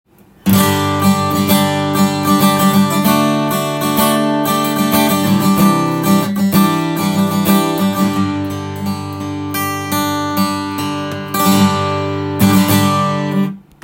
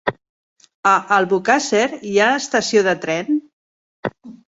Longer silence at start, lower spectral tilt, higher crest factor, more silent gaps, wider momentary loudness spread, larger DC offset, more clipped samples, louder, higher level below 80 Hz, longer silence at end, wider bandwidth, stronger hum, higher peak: first, 0.45 s vs 0.05 s; first, -5 dB/octave vs -3.5 dB/octave; about the same, 14 dB vs 18 dB; second, none vs 0.29-0.56 s, 0.74-0.83 s, 3.53-4.03 s; second, 9 LU vs 12 LU; neither; neither; first, -14 LUFS vs -17 LUFS; first, -50 dBFS vs -60 dBFS; about the same, 0.25 s vs 0.15 s; first, 17 kHz vs 8 kHz; neither; about the same, 0 dBFS vs -2 dBFS